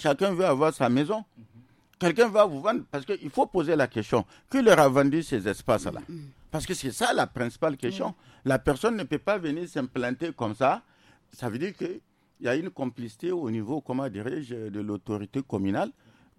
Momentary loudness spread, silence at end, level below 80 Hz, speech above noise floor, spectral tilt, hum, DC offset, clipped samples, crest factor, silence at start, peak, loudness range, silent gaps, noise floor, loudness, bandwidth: 12 LU; 0.45 s; -56 dBFS; 30 dB; -5.5 dB/octave; none; under 0.1%; under 0.1%; 20 dB; 0 s; -8 dBFS; 8 LU; none; -57 dBFS; -27 LUFS; 15.5 kHz